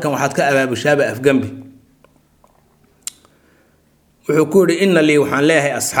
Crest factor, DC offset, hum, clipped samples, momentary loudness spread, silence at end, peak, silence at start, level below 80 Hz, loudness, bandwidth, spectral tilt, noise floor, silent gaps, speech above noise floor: 16 dB; under 0.1%; none; under 0.1%; 18 LU; 0 s; 0 dBFS; 0 s; -58 dBFS; -15 LUFS; 19 kHz; -4.5 dB/octave; -56 dBFS; none; 42 dB